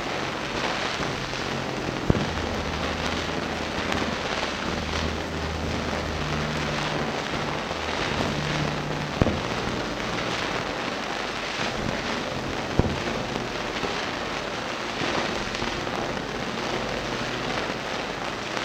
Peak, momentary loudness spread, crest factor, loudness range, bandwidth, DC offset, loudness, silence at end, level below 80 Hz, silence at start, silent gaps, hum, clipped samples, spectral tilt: 0 dBFS; 4 LU; 28 dB; 1 LU; 17 kHz; under 0.1%; -27 LUFS; 0 s; -42 dBFS; 0 s; none; none; under 0.1%; -4.5 dB/octave